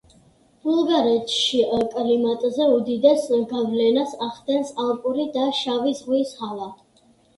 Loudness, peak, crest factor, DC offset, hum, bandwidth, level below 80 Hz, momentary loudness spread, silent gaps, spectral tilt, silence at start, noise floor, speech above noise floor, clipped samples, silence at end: -21 LUFS; -4 dBFS; 18 dB; under 0.1%; none; 11.5 kHz; -62 dBFS; 10 LU; none; -4.5 dB/octave; 0.65 s; -58 dBFS; 37 dB; under 0.1%; 0.65 s